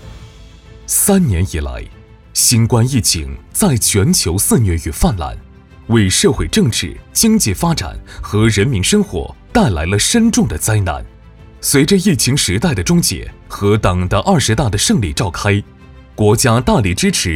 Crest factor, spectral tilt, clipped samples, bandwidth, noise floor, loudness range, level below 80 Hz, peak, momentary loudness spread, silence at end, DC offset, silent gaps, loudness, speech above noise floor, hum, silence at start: 14 dB; -4.5 dB/octave; under 0.1%; 18.5 kHz; -38 dBFS; 1 LU; -30 dBFS; 0 dBFS; 10 LU; 0 s; under 0.1%; none; -14 LUFS; 24 dB; none; 0 s